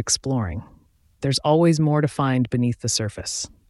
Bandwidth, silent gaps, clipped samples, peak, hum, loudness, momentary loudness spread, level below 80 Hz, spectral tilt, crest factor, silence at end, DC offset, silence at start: 12 kHz; none; under 0.1%; -6 dBFS; none; -22 LUFS; 10 LU; -46 dBFS; -5 dB/octave; 16 dB; 0.25 s; under 0.1%; 0 s